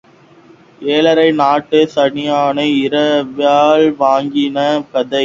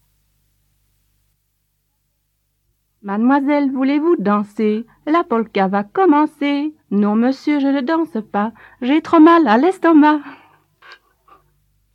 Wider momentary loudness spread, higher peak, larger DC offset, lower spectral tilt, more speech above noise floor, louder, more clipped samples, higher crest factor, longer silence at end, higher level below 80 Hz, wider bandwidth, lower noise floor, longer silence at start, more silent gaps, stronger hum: second, 6 LU vs 11 LU; about the same, 0 dBFS vs 0 dBFS; neither; second, -5.5 dB/octave vs -7.5 dB/octave; second, 31 dB vs 53 dB; first, -13 LUFS vs -16 LUFS; neither; about the same, 14 dB vs 16 dB; second, 0 s vs 1.6 s; first, -58 dBFS vs -68 dBFS; second, 7.6 kHz vs 8.6 kHz; second, -44 dBFS vs -68 dBFS; second, 0.8 s vs 3.05 s; neither; second, none vs 50 Hz at -65 dBFS